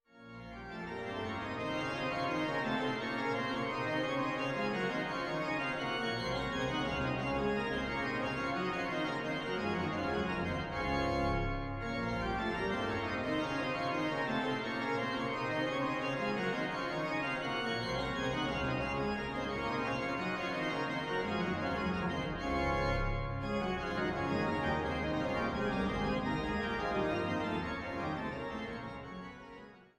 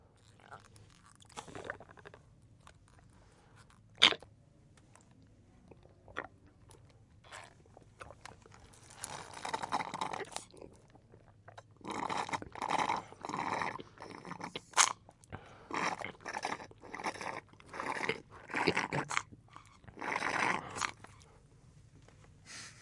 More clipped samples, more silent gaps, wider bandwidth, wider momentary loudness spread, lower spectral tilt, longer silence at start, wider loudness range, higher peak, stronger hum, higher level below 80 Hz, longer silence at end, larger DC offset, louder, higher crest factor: neither; neither; first, 13 kHz vs 11.5 kHz; second, 5 LU vs 23 LU; first, -6 dB/octave vs -1.5 dB/octave; second, 0.15 s vs 0.3 s; second, 1 LU vs 17 LU; second, -20 dBFS vs -4 dBFS; neither; first, -50 dBFS vs -68 dBFS; first, 0.15 s vs 0 s; neither; about the same, -35 LUFS vs -36 LUFS; second, 14 dB vs 36 dB